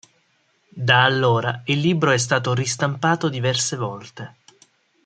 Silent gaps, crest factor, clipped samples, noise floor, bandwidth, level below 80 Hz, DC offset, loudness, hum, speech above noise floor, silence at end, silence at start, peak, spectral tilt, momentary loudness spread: none; 20 dB; under 0.1%; -64 dBFS; 9.4 kHz; -62 dBFS; under 0.1%; -20 LUFS; none; 44 dB; 0.75 s; 0.75 s; -2 dBFS; -4 dB/octave; 15 LU